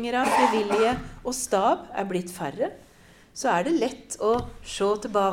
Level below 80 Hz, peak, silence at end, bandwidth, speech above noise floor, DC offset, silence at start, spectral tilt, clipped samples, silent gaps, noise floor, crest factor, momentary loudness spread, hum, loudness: -50 dBFS; -8 dBFS; 0 s; 17 kHz; 28 dB; under 0.1%; 0 s; -4 dB/octave; under 0.1%; none; -53 dBFS; 18 dB; 10 LU; none; -25 LUFS